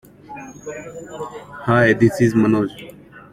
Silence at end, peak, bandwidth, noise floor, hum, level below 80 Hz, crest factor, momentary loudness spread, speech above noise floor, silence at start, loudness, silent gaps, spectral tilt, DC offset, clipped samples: 0.1 s; -2 dBFS; 14.5 kHz; -37 dBFS; none; -50 dBFS; 18 dB; 22 LU; 19 dB; 0.3 s; -17 LUFS; none; -7 dB/octave; under 0.1%; under 0.1%